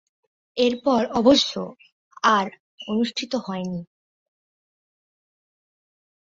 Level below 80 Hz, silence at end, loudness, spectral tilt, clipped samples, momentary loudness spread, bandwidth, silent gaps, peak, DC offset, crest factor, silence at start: -60 dBFS; 2.55 s; -22 LUFS; -4.5 dB/octave; under 0.1%; 17 LU; 7.8 kHz; 1.92-2.11 s, 2.60-2.78 s; -4 dBFS; under 0.1%; 22 dB; 0.55 s